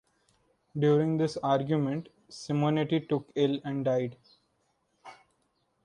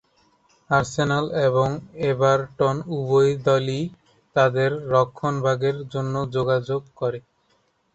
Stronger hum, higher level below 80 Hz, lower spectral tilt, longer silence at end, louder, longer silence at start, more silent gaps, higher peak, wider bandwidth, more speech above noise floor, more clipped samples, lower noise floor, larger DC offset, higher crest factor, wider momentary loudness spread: neither; second, -70 dBFS vs -56 dBFS; about the same, -7.5 dB/octave vs -6.5 dB/octave; about the same, 0.7 s vs 0.75 s; second, -29 LUFS vs -22 LUFS; about the same, 0.75 s vs 0.7 s; neither; second, -14 dBFS vs -4 dBFS; first, 10.5 kHz vs 8.2 kHz; about the same, 46 dB vs 44 dB; neither; first, -74 dBFS vs -66 dBFS; neither; about the same, 18 dB vs 18 dB; first, 12 LU vs 9 LU